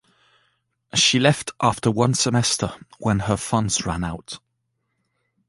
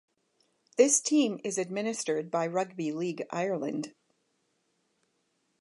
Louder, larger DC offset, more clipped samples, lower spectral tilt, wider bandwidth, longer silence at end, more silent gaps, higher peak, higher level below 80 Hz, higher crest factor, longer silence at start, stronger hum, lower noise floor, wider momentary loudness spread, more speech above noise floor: first, -21 LUFS vs -29 LUFS; neither; neither; about the same, -4 dB/octave vs -3.5 dB/octave; about the same, 11.5 kHz vs 11.5 kHz; second, 1.1 s vs 1.7 s; neither; first, -2 dBFS vs -8 dBFS; first, -46 dBFS vs -86 dBFS; about the same, 20 dB vs 22 dB; first, 0.95 s vs 0.8 s; neither; about the same, -74 dBFS vs -76 dBFS; about the same, 13 LU vs 11 LU; first, 53 dB vs 47 dB